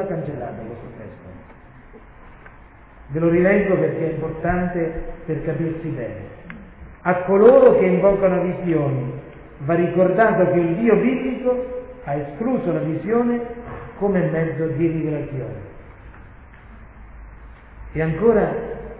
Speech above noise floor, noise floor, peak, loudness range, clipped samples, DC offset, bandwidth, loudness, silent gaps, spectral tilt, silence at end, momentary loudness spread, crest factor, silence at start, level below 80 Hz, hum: 26 dB; -45 dBFS; -2 dBFS; 9 LU; under 0.1%; under 0.1%; 4 kHz; -19 LUFS; none; -12 dB/octave; 0 s; 19 LU; 18 dB; 0 s; -42 dBFS; none